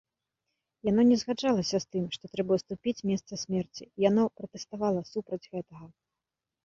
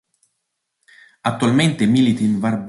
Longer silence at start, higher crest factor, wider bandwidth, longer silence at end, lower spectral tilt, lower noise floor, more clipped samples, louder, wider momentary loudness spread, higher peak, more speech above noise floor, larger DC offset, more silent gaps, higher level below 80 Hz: second, 0.85 s vs 1.25 s; first, 20 dB vs 14 dB; second, 7.6 kHz vs 11.5 kHz; first, 0.75 s vs 0 s; about the same, -6 dB/octave vs -6 dB/octave; first, -89 dBFS vs -75 dBFS; neither; second, -29 LUFS vs -17 LUFS; first, 16 LU vs 8 LU; second, -12 dBFS vs -4 dBFS; about the same, 60 dB vs 59 dB; neither; neither; second, -66 dBFS vs -56 dBFS